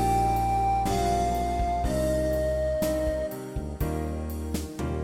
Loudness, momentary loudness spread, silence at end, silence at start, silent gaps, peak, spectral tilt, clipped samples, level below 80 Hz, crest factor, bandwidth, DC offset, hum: -27 LUFS; 8 LU; 0 s; 0 s; none; -14 dBFS; -6 dB/octave; under 0.1%; -34 dBFS; 12 dB; 17 kHz; under 0.1%; none